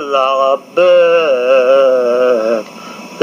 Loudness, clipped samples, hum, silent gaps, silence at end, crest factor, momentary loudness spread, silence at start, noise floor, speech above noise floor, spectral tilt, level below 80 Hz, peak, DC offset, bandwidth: -11 LUFS; under 0.1%; none; none; 0 s; 12 dB; 13 LU; 0 s; -30 dBFS; 20 dB; -4 dB/octave; -76 dBFS; 0 dBFS; under 0.1%; 9.4 kHz